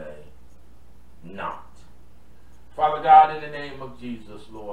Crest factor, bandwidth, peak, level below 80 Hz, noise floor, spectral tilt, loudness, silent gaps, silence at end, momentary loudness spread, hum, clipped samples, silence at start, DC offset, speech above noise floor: 22 dB; 4.7 kHz; -2 dBFS; -52 dBFS; -52 dBFS; -6 dB/octave; -19 LUFS; none; 0 s; 27 LU; none; under 0.1%; 0 s; 1%; 17 dB